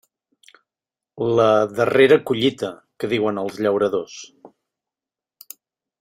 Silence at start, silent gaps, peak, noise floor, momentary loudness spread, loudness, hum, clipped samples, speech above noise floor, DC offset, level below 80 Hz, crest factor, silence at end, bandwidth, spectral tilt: 1.15 s; none; -2 dBFS; -89 dBFS; 22 LU; -19 LUFS; none; under 0.1%; 71 dB; under 0.1%; -62 dBFS; 20 dB; 1.55 s; 16 kHz; -5.5 dB/octave